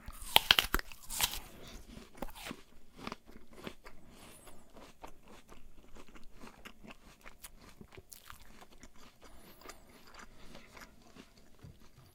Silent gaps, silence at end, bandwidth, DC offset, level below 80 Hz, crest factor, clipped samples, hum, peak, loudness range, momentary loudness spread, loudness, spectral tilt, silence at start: none; 0.05 s; 17.5 kHz; under 0.1%; -54 dBFS; 40 dB; under 0.1%; none; 0 dBFS; 21 LU; 26 LU; -32 LUFS; -1 dB/octave; 0 s